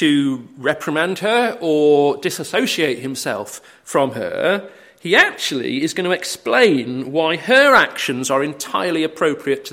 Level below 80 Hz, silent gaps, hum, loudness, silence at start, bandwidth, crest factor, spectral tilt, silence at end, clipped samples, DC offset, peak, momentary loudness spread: -64 dBFS; none; none; -17 LUFS; 0 s; 16.5 kHz; 18 dB; -3.5 dB/octave; 0 s; under 0.1%; under 0.1%; 0 dBFS; 9 LU